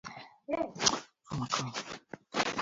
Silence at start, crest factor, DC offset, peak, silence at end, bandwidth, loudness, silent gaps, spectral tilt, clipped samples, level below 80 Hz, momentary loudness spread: 0.05 s; 30 dB; under 0.1%; -6 dBFS; 0 s; 7.6 kHz; -33 LUFS; none; -2.5 dB/octave; under 0.1%; -64 dBFS; 17 LU